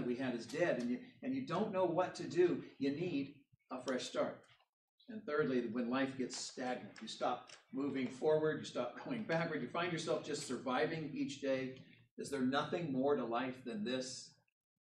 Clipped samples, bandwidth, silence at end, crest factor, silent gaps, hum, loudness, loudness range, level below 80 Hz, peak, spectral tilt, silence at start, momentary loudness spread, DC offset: under 0.1%; 11.5 kHz; 0.55 s; 18 dB; 4.69-4.98 s, 12.11-12.17 s; none; -39 LUFS; 3 LU; -82 dBFS; -22 dBFS; -5 dB/octave; 0 s; 11 LU; under 0.1%